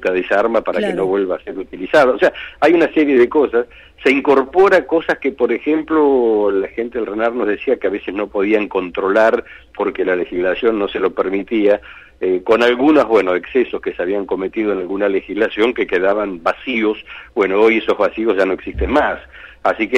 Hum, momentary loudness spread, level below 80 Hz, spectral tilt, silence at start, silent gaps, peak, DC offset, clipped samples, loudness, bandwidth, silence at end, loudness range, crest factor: none; 9 LU; -42 dBFS; -6 dB/octave; 0 s; none; -4 dBFS; under 0.1%; under 0.1%; -16 LUFS; 9.8 kHz; 0 s; 4 LU; 12 dB